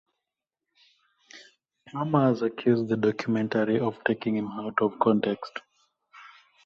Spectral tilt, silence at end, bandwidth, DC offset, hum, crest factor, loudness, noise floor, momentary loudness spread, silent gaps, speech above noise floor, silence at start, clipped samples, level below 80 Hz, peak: -8 dB/octave; 0.4 s; 7 kHz; under 0.1%; none; 20 dB; -26 LUFS; -87 dBFS; 10 LU; none; 62 dB; 1.35 s; under 0.1%; -68 dBFS; -8 dBFS